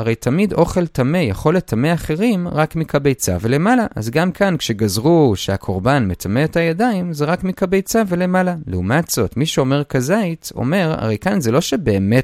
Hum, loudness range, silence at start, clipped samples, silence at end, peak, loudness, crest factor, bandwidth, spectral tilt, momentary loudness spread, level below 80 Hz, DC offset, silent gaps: none; 1 LU; 0 s; under 0.1%; 0 s; 0 dBFS; -17 LUFS; 16 dB; 16 kHz; -6 dB/octave; 4 LU; -40 dBFS; under 0.1%; none